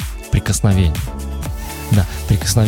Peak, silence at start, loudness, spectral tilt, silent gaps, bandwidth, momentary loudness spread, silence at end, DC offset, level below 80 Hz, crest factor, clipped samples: -2 dBFS; 0 s; -18 LUFS; -5 dB/octave; none; 17.5 kHz; 11 LU; 0 s; under 0.1%; -24 dBFS; 16 dB; under 0.1%